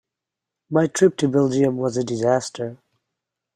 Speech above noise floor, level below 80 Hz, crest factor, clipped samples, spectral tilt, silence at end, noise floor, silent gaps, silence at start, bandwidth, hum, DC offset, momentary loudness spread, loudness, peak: 66 dB; -64 dBFS; 18 dB; under 0.1%; -6 dB/octave; 0.8 s; -85 dBFS; none; 0.7 s; 13 kHz; none; under 0.1%; 11 LU; -20 LUFS; -4 dBFS